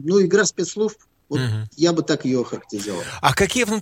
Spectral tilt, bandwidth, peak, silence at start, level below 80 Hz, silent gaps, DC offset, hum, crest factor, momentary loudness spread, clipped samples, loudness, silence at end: -4.5 dB/octave; 16.5 kHz; 0 dBFS; 0 s; -50 dBFS; none; under 0.1%; none; 20 dB; 11 LU; under 0.1%; -21 LUFS; 0 s